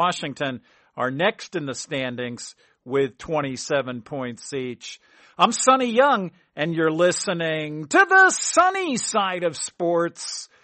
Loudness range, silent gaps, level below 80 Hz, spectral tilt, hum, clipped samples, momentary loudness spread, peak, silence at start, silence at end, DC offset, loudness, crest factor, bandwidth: 9 LU; none; -64 dBFS; -3 dB/octave; none; under 0.1%; 14 LU; -4 dBFS; 0 s; 0.2 s; under 0.1%; -22 LUFS; 18 dB; 8.8 kHz